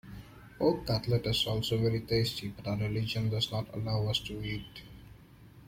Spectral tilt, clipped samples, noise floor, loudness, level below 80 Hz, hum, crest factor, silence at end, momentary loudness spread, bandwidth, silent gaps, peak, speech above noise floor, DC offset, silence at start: -6 dB/octave; under 0.1%; -54 dBFS; -32 LUFS; -52 dBFS; none; 18 dB; 0 s; 18 LU; 16.5 kHz; none; -14 dBFS; 23 dB; under 0.1%; 0.05 s